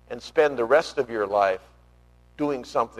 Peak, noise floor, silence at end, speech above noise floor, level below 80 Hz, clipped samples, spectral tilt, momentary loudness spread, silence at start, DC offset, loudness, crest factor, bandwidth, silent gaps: -8 dBFS; -55 dBFS; 0 s; 32 dB; -56 dBFS; under 0.1%; -4.5 dB/octave; 7 LU; 0.1 s; under 0.1%; -24 LUFS; 18 dB; 13 kHz; none